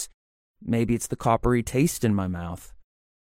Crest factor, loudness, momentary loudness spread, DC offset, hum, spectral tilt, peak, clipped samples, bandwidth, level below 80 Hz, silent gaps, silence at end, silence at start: 18 dB; -25 LUFS; 14 LU; under 0.1%; none; -6 dB/octave; -8 dBFS; under 0.1%; 16.5 kHz; -42 dBFS; 0.14-0.54 s; 0.75 s; 0 s